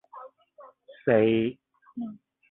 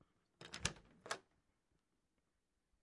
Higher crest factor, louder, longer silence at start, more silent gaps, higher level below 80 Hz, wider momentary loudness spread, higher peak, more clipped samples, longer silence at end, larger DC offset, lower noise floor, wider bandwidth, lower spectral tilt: second, 20 dB vs 34 dB; first, -26 LUFS vs -47 LUFS; second, 0.15 s vs 0.4 s; neither; about the same, -66 dBFS vs -70 dBFS; first, 24 LU vs 15 LU; first, -8 dBFS vs -20 dBFS; neither; second, 0.35 s vs 1.6 s; neither; second, -54 dBFS vs -87 dBFS; second, 4 kHz vs 12 kHz; first, -10.5 dB/octave vs -2 dB/octave